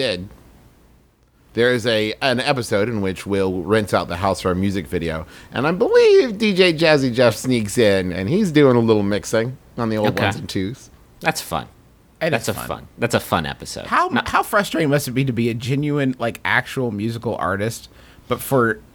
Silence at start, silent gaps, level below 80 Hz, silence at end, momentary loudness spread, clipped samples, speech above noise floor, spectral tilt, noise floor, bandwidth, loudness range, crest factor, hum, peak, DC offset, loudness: 0 s; none; -48 dBFS; 0.15 s; 12 LU; under 0.1%; 36 dB; -5.5 dB/octave; -55 dBFS; over 20 kHz; 7 LU; 18 dB; none; -2 dBFS; under 0.1%; -19 LUFS